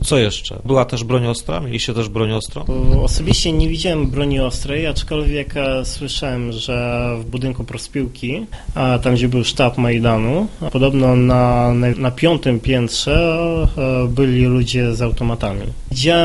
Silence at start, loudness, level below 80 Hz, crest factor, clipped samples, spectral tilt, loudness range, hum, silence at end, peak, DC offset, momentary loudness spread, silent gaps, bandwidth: 0 s; -18 LUFS; -24 dBFS; 16 dB; under 0.1%; -5.5 dB/octave; 6 LU; none; 0 s; 0 dBFS; under 0.1%; 9 LU; none; 11.5 kHz